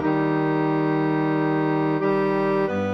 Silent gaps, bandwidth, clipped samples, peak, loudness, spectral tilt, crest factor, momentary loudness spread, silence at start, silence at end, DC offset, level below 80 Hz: none; 6.2 kHz; under 0.1%; -10 dBFS; -22 LUFS; -9 dB/octave; 12 dB; 1 LU; 0 s; 0 s; 0.1%; -64 dBFS